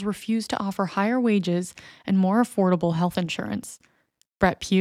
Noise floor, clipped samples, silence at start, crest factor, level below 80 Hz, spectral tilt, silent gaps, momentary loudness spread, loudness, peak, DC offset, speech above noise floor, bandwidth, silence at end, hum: -65 dBFS; under 0.1%; 0 s; 18 dB; -54 dBFS; -6 dB/octave; none; 10 LU; -24 LUFS; -6 dBFS; under 0.1%; 41 dB; 14.5 kHz; 0 s; none